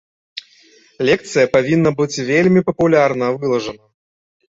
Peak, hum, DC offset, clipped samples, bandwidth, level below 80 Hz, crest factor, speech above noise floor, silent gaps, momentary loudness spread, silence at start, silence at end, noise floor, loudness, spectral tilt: -2 dBFS; none; under 0.1%; under 0.1%; 8 kHz; -52 dBFS; 16 dB; 35 dB; none; 18 LU; 0.35 s; 0.8 s; -50 dBFS; -16 LUFS; -6 dB/octave